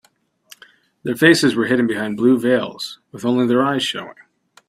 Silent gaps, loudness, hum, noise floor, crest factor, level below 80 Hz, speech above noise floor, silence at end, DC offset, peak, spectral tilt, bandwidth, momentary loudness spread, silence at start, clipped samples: none; -17 LUFS; none; -58 dBFS; 18 dB; -60 dBFS; 41 dB; 0.55 s; under 0.1%; 0 dBFS; -5 dB/octave; 15.5 kHz; 16 LU; 1.05 s; under 0.1%